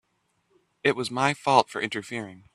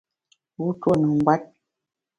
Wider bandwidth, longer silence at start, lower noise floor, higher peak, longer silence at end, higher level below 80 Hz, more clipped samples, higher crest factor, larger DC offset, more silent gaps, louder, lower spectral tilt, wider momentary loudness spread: first, 14 kHz vs 9.4 kHz; first, 0.85 s vs 0.6 s; second, -72 dBFS vs -86 dBFS; about the same, -4 dBFS vs -4 dBFS; second, 0.15 s vs 0.75 s; second, -68 dBFS vs -60 dBFS; neither; about the same, 24 dB vs 22 dB; neither; neither; second, -25 LUFS vs -22 LUFS; second, -4 dB/octave vs -9 dB/octave; first, 12 LU vs 9 LU